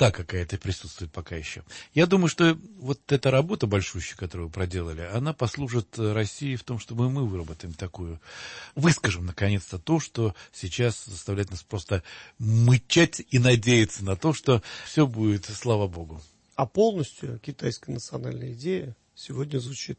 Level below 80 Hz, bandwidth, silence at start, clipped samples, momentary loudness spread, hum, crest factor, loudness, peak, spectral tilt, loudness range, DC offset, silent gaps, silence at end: -50 dBFS; 8.8 kHz; 0 s; under 0.1%; 16 LU; none; 18 dB; -26 LUFS; -8 dBFS; -5.5 dB/octave; 7 LU; under 0.1%; none; 0.05 s